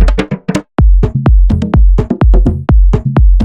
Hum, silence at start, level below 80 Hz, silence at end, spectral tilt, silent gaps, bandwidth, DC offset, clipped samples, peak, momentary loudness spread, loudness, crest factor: none; 0 s; -8 dBFS; 0 s; -8.5 dB/octave; none; 8.4 kHz; under 0.1%; under 0.1%; 0 dBFS; 6 LU; -11 LUFS; 8 dB